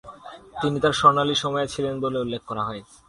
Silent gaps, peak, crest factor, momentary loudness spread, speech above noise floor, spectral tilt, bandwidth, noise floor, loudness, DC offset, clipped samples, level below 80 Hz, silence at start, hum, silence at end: none; -2 dBFS; 22 dB; 17 LU; 19 dB; -4.5 dB/octave; 11.5 kHz; -43 dBFS; -23 LUFS; under 0.1%; under 0.1%; -54 dBFS; 0.05 s; none; 0.25 s